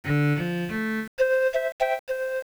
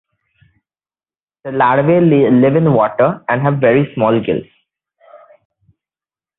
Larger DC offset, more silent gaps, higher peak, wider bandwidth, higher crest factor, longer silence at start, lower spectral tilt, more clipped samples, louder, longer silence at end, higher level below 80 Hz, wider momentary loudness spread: neither; first, 1.08-1.17 s, 1.72-1.79 s, 1.99-2.07 s vs none; second, -12 dBFS vs 0 dBFS; first, over 20 kHz vs 4 kHz; about the same, 14 dB vs 14 dB; second, 0.05 s vs 1.45 s; second, -7 dB/octave vs -13 dB/octave; neither; second, -26 LUFS vs -13 LUFS; second, 0 s vs 1.25 s; about the same, -56 dBFS vs -54 dBFS; second, 6 LU vs 9 LU